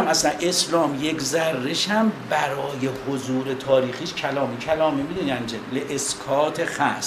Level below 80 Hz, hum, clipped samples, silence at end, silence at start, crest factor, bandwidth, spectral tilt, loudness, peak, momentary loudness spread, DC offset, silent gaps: -56 dBFS; none; under 0.1%; 0 s; 0 s; 18 dB; 15.5 kHz; -3.5 dB/octave; -23 LUFS; -6 dBFS; 7 LU; under 0.1%; none